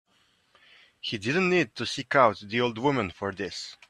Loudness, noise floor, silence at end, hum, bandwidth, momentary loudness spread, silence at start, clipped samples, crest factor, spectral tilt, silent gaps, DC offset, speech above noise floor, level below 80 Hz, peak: -26 LUFS; -67 dBFS; 0.15 s; none; 11 kHz; 12 LU; 1.05 s; under 0.1%; 22 dB; -5 dB/octave; none; under 0.1%; 40 dB; -66 dBFS; -6 dBFS